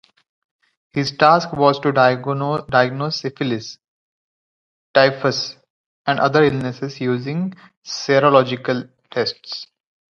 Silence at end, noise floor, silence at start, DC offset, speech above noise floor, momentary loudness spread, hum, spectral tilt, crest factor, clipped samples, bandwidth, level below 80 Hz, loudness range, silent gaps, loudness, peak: 0.55 s; under -90 dBFS; 0.95 s; under 0.1%; over 72 dB; 13 LU; none; -5.5 dB/octave; 20 dB; under 0.1%; 7.4 kHz; -58 dBFS; 3 LU; 3.88-4.94 s, 5.70-6.05 s, 7.77-7.82 s; -18 LUFS; 0 dBFS